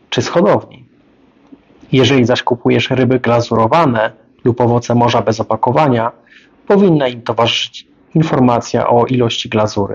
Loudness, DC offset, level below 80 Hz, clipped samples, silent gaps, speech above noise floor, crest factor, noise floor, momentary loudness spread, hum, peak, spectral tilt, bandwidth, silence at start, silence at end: -13 LUFS; under 0.1%; -48 dBFS; under 0.1%; none; 37 dB; 14 dB; -49 dBFS; 6 LU; none; 0 dBFS; -6 dB/octave; 7.6 kHz; 0.1 s; 0 s